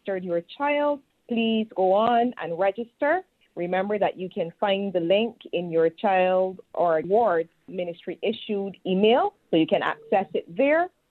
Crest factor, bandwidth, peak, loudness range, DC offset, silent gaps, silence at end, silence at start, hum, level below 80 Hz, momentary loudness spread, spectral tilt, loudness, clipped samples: 18 dB; 4.4 kHz; -8 dBFS; 2 LU; under 0.1%; none; 0.2 s; 0.05 s; none; -72 dBFS; 10 LU; -8 dB/octave; -25 LUFS; under 0.1%